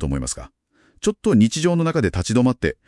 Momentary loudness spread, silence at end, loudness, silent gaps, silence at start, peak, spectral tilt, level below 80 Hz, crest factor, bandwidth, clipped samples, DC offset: 9 LU; 0.15 s; -20 LUFS; none; 0 s; -4 dBFS; -5.5 dB/octave; -38 dBFS; 16 dB; 12 kHz; under 0.1%; under 0.1%